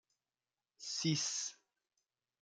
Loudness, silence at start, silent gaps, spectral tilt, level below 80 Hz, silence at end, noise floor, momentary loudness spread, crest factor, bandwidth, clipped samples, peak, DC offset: -38 LUFS; 0.8 s; none; -3 dB/octave; -84 dBFS; 0.9 s; under -90 dBFS; 11 LU; 22 dB; 10.5 kHz; under 0.1%; -22 dBFS; under 0.1%